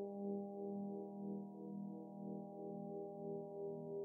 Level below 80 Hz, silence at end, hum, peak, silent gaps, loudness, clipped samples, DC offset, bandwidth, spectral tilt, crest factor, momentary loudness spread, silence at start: under -90 dBFS; 0 s; none; -34 dBFS; none; -49 LUFS; under 0.1%; under 0.1%; 1.2 kHz; -4 dB/octave; 12 dB; 4 LU; 0 s